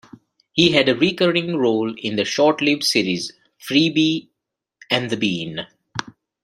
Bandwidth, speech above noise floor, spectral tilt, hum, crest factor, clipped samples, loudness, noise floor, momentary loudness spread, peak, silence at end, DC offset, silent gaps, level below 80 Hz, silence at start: 14 kHz; 62 dB; -4.5 dB/octave; none; 20 dB; under 0.1%; -19 LUFS; -81 dBFS; 15 LU; -2 dBFS; 0.35 s; under 0.1%; none; -60 dBFS; 0.55 s